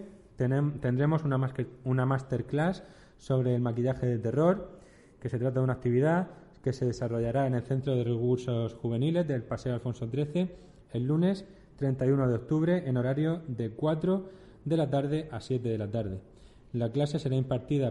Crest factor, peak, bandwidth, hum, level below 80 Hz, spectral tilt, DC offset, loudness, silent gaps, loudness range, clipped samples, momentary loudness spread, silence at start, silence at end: 16 dB; -12 dBFS; 10.5 kHz; none; -56 dBFS; -8.5 dB/octave; under 0.1%; -30 LUFS; none; 2 LU; under 0.1%; 8 LU; 0 s; 0 s